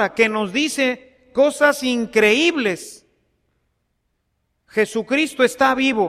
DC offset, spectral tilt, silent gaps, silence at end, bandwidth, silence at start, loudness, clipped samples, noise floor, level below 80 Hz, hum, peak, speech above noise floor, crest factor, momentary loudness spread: under 0.1%; -3.5 dB/octave; none; 0 s; 15 kHz; 0 s; -18 LUFS; under 0.1%; -71 dBFS; -58 dBFS; none; -2 dBFS; 53 dB; 18 dB; 10 LU